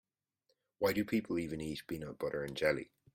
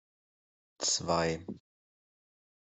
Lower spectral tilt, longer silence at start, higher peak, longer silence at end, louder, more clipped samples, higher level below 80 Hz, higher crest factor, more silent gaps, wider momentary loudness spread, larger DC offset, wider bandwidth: first, -5.5 dB/octave vs -2.5 dB/octave; about the same, 0.8 s vs 0.8 s; second, -18 dBFS vs -14 dBFS; second, 0.3 s vs 1.2 s; second, -37 LUFS vs -31 LUFS; neither; about the same, -64 dBFS vs -66 dBFS; about the same, 20 dB vs 22 dB; neither; second, 8 LU vs 18 LU; neither; first, 16.5 kHz vs 8.2 kHz